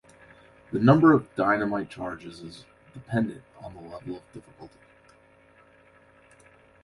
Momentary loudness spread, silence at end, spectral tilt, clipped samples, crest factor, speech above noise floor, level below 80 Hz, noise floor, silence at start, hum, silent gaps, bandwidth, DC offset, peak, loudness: 26 LU; 2.15 s; -8.5 dB/octave; under 0.1%; 22 dB; 32 dB; -60 dBFS; -57 dBFS; 0.7 s; none; none; 11.5 kHz; under 0.1%; -6 dBFS; -24 LUFS